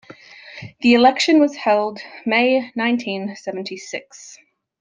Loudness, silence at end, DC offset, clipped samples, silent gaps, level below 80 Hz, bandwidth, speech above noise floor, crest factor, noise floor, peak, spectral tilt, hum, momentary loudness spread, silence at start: -18 LUFS; 0.5 s; under 0.1%; under 0.1%; none; -66 dBFS; 9.4 kHz; 24 dB; 18 dB; -42 dBFS; -2 dBFS; -4 dB/octave; none; 23 LU; 0.1 s